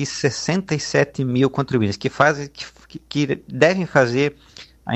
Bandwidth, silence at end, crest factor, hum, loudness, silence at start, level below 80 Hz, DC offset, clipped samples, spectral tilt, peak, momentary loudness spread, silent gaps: 8.6 kHz; 0 s; 20 dB; none; -20 LUFS; 0 s; -52 dBFS; under 0.1%; under 0.1%; -5.5 dB/octave; 0 dBFS; 10 LU; none